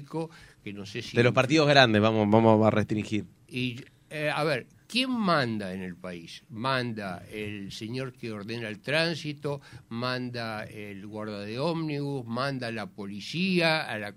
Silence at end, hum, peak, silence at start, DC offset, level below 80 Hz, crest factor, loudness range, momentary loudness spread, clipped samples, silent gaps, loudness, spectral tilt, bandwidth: 0 s; none; -2 dBFS; 0 s; under 0.1%; -64 dBFS; 26 dB; 10 LU; 18 LU; under 0.1%; none; -27 LUFS; -6 dB/octave; 14.5 kHz